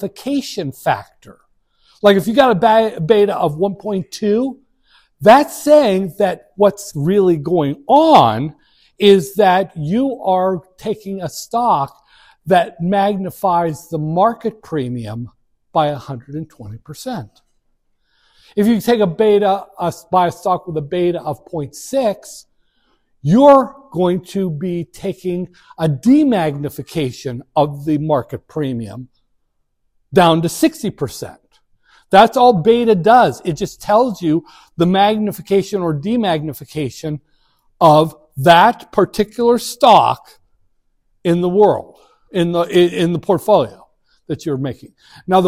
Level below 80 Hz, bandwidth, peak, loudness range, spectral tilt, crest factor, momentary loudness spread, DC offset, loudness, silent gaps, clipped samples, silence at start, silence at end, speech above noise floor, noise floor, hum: -52 dBFS; 16 kHz; 0 dBFS; 6 LU; -6 dB/octave; 16 dB; 15 LU; under 0.1%; -15 LUFS; none; 0.1%; 0 s; 0 s; 50 dB; -65 dBFS; none